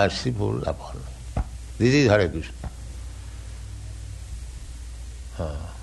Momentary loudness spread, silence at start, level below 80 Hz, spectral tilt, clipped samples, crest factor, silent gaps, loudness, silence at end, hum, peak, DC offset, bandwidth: 20 LU; 0 s; -36 dBFS; -6 dB/octave; under 0.1%; 22 dB; none; -25 LUFS; 0 s; none; -4 dBFS; under 0.1%; 12 kHz